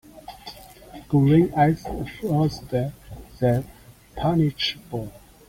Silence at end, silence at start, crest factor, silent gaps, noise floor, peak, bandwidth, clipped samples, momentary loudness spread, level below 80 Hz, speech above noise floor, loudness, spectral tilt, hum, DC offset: 0.35 s; 0.15 s; 18 dB; none; -44 dBFS; -6 dBFS; 16.5 kHz; under 0.1%; 25 LU; -46 dBFS; 22 dB; -23 LUFS; -7.5 dB/octave; none; under 0.1%